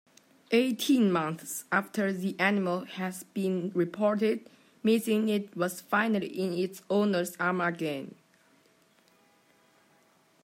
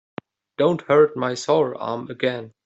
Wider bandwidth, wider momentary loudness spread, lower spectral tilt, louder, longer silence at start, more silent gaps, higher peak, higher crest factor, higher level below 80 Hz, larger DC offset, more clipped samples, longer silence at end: first, 16 kHz vs 8.2 kHz; second, 8 LU vs 20 LU; about the same, -5.5 dB/octave vs -5.5 dB/octave; second, -29 LUFS vs -21 LUFS; about the same, 0.5 s vs 0.6 s; neither; second, -12 dBFS vs -6 dBFS; about the same, 18 dB vs 16 dB; second, -80 dBFS vs -66 dBFS; neither; neither; first, 2.35 s vs 0.15 s